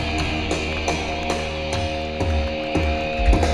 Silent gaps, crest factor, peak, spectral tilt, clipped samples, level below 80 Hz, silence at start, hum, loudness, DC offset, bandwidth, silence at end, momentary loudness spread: none; 18 dB; -4 dBFS; -5 dB/octave; under 0.1%; -26 dBFS; 0 s; none; -23 LUFS; under 0.1%; 12 kHz; 0 s; 3 LU